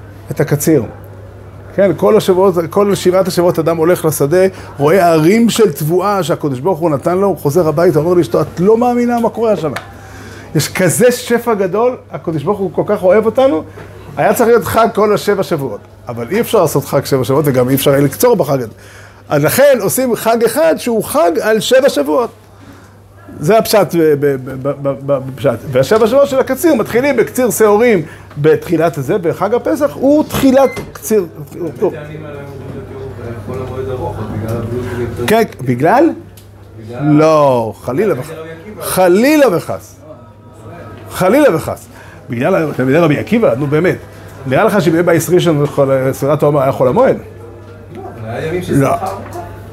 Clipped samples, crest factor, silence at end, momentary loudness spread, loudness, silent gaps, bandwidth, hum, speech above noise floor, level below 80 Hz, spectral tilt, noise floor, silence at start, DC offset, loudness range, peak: under 0.1%; 12 dB; 0 s; 16 LU; -12 LUFS; none; 16 kHz; none; 26 dB; -44 dBFS; -5.5 dB/octave; -38 dBFS; 0 s; under 0.1%; 4 LU; 0 dBFS